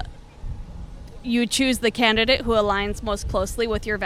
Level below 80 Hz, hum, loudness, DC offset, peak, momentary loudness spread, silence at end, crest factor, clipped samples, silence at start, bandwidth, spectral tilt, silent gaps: -36 dBFS; none; -21 LUFS; under 0.1%; -6 dBFS; 21 LU; 0 s; 18 dB; under 0.1%; 0 s; 15.5 kHz; -3.5 dB/octave; none